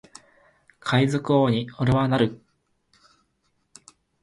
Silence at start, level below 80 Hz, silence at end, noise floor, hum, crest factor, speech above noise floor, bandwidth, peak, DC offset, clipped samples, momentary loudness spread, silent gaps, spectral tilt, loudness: 0.85 s; -52 dBFS; 1.85 s; -71 dBFS; none; 18 dB; 50 dB; 11.5 kHz; -6 dBFS; under 0.1%; under 0.1%; 4 LU; none; -7 dB/octave; -23 LUFS